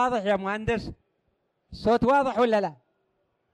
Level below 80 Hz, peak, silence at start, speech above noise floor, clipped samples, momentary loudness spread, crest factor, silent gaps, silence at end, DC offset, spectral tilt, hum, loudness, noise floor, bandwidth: -50 dBFS; -12 dBFS; 0 s; 49 dB; under 0.1%; 10 LU; 14 dB; none; 0.8 s; under 0.1%; -6.5 dB/octave; none; -25 LUFS; -74 dBFS; 11 kHz